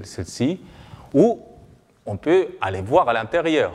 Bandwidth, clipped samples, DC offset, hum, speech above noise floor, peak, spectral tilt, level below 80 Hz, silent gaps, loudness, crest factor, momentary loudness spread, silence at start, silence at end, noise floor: 12 kHz; under 0.1%; under 0.1%; none; 30 dB; -2 dBFS; -6 dB/octave; -52 dBFS; none; -21 LUFS; 20 dB; 15 LU; 0 s; 0 s; -50 dBFS